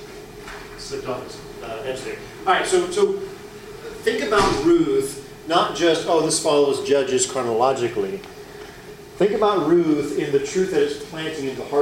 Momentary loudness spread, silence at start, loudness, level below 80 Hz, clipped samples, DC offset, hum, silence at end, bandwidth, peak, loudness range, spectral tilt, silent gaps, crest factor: 19 LU; 0 s; -21 LUFS; -48 dBFS; under 0.1%; under 0.1%; none; 0 s; 16 kHz; -4 dBFS; 5 LU; -4 dB/octave; none; 16 dB